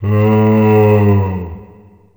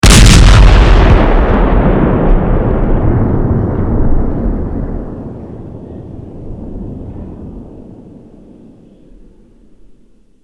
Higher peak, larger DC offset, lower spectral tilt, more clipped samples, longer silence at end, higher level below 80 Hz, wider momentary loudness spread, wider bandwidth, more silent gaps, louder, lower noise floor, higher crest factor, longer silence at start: about the same, 0 dBFS vs 0 dBFS; neither; first, -10 dB/octave vs -5.5 dB/octave; second, under 0.1% vs 1%; second, 0.55 s vs 2.5 s; second, -42 dBFS vs -12 dBFS; second, 13 LU vs 23 LU; first, over 20 kHz vs 13 kHz; neither; about the same, -11 LUFS vs -10 LUFS; about the same, -42 dBFS vs -44 dBFS; about the same, 12 dB vs 10 dB; about the same, 0 s vs 0.05 s